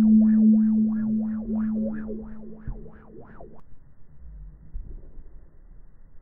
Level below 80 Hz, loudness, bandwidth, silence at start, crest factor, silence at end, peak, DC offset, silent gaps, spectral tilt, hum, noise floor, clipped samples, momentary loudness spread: -44 dBFS; -22 LUFS; 2 kHz; 0 s; 14 dB; 0 s; -10 dBFS; under 0.1%; none; -13.5 dB/octave; none; -45 dBFS; under 0.1%; 27 LU